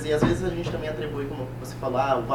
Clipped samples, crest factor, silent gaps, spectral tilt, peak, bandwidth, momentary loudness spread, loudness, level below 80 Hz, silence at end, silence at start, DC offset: under 0.1%; 20 dB; none; -6.5 dB/octave; -6 dBFS; 18 kHz; 9 LU; -27 LUFS; -42 dBFS; 0 s; 0 s; under 0.1%